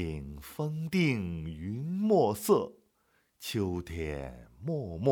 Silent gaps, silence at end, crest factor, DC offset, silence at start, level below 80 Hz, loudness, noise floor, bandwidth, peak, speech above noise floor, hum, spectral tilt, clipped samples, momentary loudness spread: none; 0 s; 20 dB; under 0.1%; 0 s; -54 dBFS; -32 LUFS; -72 dBFS; over 20 kHz; -12 dBFS; 41 dB; none; -6.5 dB/octave; under 0.1%; 15 LU